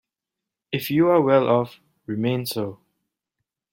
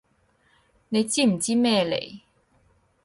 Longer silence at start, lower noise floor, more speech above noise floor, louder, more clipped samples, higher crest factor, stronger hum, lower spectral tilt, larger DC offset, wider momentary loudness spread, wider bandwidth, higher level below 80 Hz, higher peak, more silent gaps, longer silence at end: second, 0.7 s vs 0.9 s; first, -86 dBFS vs -65 dBFS; first, 66 dB vs 42 dB; about the same, -21 LUFS vs -23 LUFS; neither; about the same, 18 dB vs 18 dB; neither; first, -6.5 dB/octave vs -4 dB/octave; neither; first, 14 LU vs 8 LU; first, 16.5 kHz vs 11.5 kHz; about the same, -66 dBFS vs -64 dBFS; first, -4 dBFS vs -10 dBFS; neither; first, 1 s vs 0.85 s